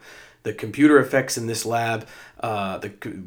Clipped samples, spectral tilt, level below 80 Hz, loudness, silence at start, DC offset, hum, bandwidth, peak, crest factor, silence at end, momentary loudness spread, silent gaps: under 0.1%; -5 dB/octave; -64 dBFS; -22 LUFS; 0.05 s; under 0.1%; none; 17.5 kHz; -2 dBFS; 20 dB; 0 s; 17 LU; none